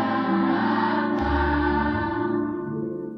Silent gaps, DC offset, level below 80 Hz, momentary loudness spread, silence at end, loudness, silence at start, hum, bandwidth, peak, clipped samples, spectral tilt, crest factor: none; under 0.1%; -36 dBFS; 7 LU; 0 s; -24 LUFS; 0 s; none; 6 kHz; -10 dBFS; under 0.1%; -8.5 dB/octave; 12 dB